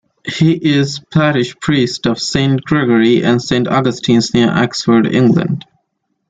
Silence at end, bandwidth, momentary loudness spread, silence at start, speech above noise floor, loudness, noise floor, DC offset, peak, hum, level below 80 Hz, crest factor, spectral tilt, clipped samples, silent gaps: 0.7 s; 9.2 kHz; 5 LU; 0.25 s; 56 dB; -13 LUFS; -68 dBFS; under 0.1%; -2 dBFS; none; -46 dBFS; 12 dB; -6 dB/octave; under 0.1%; none